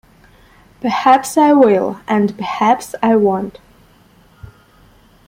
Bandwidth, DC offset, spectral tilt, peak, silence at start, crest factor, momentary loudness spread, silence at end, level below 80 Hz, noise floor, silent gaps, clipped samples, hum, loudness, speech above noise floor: 16.5 kHz; under 0.1%; -5.5 dB/octave; 0 dBFS; 0.85 s; 16 dB; 10 LU; 1.75 s; -52 dBFS; -49 dBFS; none; under 0.1%; none; -14 LUFS; 35 dB